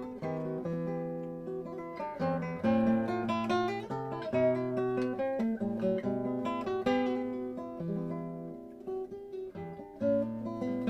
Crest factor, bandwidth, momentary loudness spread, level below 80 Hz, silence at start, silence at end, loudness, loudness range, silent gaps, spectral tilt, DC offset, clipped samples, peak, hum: 16 dB; 8.4 kHz; 12 LU; -64 dBFS; 0 s; 0 s; -34 LUFS; 6 LU; none; -8 dB/octave; under 0.1%; under 0.1%; -16 dBFS; none